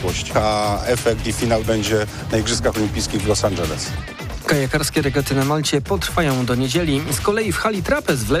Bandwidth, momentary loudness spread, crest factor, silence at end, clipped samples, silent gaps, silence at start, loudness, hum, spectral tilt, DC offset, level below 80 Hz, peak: 15.5 kHz; 3 LU; 14 dB; 0 s; under 0.1%; none; 0 s; -20 LUFS; none; -4.5 dB/octave; under 0.1%; -34 dBFS; -6 dBFS